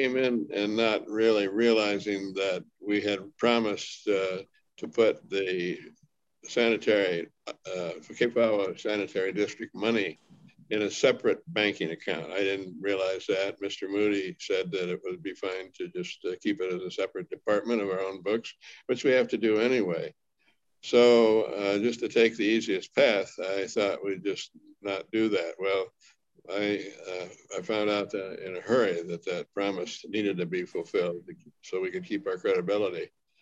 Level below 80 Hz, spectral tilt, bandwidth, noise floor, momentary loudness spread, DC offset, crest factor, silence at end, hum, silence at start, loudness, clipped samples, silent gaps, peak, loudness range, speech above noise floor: -74 dBFS; -4.5 dB/octave; 8 kHz; -72 dBFS; 12 LU; under 0.1%; 20 dB; 0.35 s; none; 0 s; -28 LUFS; under 0.1%; none; -10 dBFS; 7 LU; 44 dB